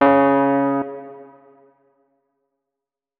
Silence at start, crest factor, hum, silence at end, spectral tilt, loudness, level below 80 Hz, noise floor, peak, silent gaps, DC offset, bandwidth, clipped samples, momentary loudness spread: 0 s; 20 dB; none; 1.95 s; -10.5 dB/octave; -18 LUFS; -66 dBFS; -86 dBFS; -2 dBFS; none; under 0.1%; 4.3 kHz; under 0.1%; 22 LU